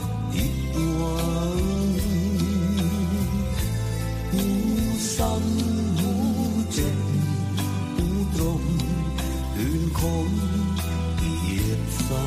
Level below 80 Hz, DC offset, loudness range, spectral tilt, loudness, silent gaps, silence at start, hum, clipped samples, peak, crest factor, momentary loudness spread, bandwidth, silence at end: -32 dBFS; under 0.1%; 1 LU; -6 dB/octave; -25 LUFS; none; 0 s; none; under 0.1%; -10 dBFS; 12 dB; 3 LU; 15.5 kHz; 0 s